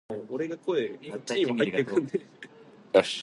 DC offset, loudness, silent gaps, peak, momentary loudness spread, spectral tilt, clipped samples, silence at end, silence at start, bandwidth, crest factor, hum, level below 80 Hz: under 0.1%; -29 LUFS; none; -8 dBFS; 17 LU; -5 dB/octave; under 0.1%; 0 s; 0.1 s; 11.5 kHz; 22 dB; none; -72 dBFS